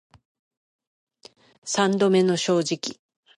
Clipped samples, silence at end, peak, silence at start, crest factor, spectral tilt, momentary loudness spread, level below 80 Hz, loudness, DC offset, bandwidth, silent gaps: under 0.1%; 0.45 s; -6 dBFS; 1.65 s; 18 dB; -4.5 dB/octave; 13 LU; -72 dBFS; -22 LUFS; under 0.1%; 11.5 kHz; none